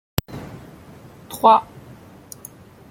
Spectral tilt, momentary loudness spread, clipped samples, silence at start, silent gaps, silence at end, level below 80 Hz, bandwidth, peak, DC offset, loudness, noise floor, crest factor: -5 dB/octave; 26 LU; under 0.1%; 0.3 s; none; 1.3 s; -50 dBFS; 16.5 kHz; -2 dBFS; under 0.1%; -18 LUFS; -44 dBFS; 22 dB